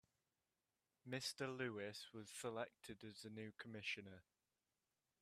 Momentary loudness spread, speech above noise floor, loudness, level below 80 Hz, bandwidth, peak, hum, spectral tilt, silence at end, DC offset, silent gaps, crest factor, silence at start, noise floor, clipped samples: 10 LU; over 39 dB; -50 LUFS; -86 dBFS; 15 kHz; -32 dBFS; none; -3.5 dB/octave; 1 s; under 0.1%; none; 20 dB; 1.05 s; under -90 dBFS; under 0.1%